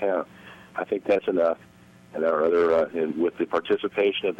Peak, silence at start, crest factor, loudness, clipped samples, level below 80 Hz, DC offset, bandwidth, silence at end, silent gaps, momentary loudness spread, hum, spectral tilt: -10 dBFS; 0 s; 14 dB; -25 LUFS; under 0.1%; -64 dBFS; under 0.1%; 7.8 kHz; 0.05 s; none; 13 LU; none; -6.5 dB/octave